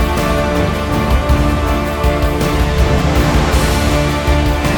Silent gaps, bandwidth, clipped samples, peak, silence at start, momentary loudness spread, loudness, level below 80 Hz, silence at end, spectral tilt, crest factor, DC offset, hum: none; 20 kHz; under 0.1%; -2 dBFS; 0 s; 3 LU; -14 LUFS; -16 dBFS; 0 s; -5.5 dB/octave; 12 dB; under 0.1%; none